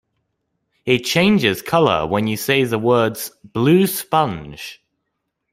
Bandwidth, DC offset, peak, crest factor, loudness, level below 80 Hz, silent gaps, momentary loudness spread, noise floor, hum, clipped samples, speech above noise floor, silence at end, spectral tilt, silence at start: 16 kHz; under 0.1%; 0 dBFS; 18 dB; -17 LUFS; -52 dBFS; none; 15 LU; -75 dBFS; none; under 0.1%; 58 dB; 0.8 s; -5 dB/octave; 0.85 s